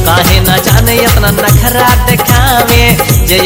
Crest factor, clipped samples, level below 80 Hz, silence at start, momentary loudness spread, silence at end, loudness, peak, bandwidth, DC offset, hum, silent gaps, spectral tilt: 6 dB; 2%; -14 dBFS; 0 s; 1 LU; 0 s; -7 LUFS; 0 dBFS; over 20 kHz; under 0.1%; none; none; -4 dB/octave